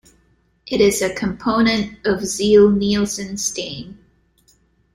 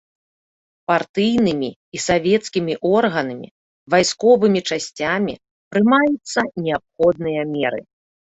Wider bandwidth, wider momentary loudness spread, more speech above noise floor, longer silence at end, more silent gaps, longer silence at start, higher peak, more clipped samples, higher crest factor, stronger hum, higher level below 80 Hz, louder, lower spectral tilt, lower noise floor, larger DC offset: first, 16 kHz vs 8.4 kHz; first, 14 LU vs 11 LU; second, 42 dB vs over 72 dB; first, 1 s vs 0.55 s; second, none vs 1.09-1.14 s, 1.76-1.92 s, 3.51-3.86 s, 5.51-5.71 s; second, 0.65 s vs 0.9 s; about the same, -2 dBFS vs -2 dBFS; neither; about the same, 16 dB vs 18 dB; neither; first, -46 dBFS vs -54 dBFS; about the same, -18 LUFS vs -19 LUFS; about the same, -4 dB/octave vs -4.5 dB/octave; second, -60 dBFS vs under -90 dBFS; neither